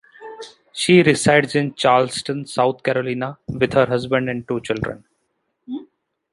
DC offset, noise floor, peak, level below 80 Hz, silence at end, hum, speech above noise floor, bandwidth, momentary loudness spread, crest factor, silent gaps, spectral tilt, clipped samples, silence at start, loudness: under 0.1%; -71 dBFS; -2 dBFS; -52 dBFS; 0.5 s; none; 53 dB; 11.5 kHz; 19 LU; 18 dB; none; -5 dB/octave; under 0.1%; 0.2 s; -19 LUFS